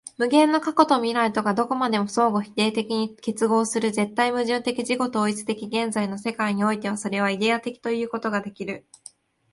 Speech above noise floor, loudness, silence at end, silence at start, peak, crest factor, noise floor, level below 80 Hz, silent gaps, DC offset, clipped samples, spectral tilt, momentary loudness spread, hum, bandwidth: 27 dB; -23 LUFS; 0.75 s; 0.2 s; -2 dBFS; 22 dB; -50 dBFS; -68 dBFS; none; under 0.1%; under 0.1%; -4.5 dB/octave; 8 LU; none; 11.5 kHz